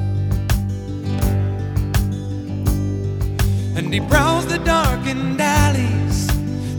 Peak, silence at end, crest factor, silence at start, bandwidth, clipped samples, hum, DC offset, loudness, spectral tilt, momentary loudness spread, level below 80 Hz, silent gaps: -2 dBFS; 0 s; 18 dB; 0 s; over 20 kHz; under 0.1%; none; under 0.1%; -19 LUFS; -5.5 dB/octave; 7 LU; -26 dBFS; none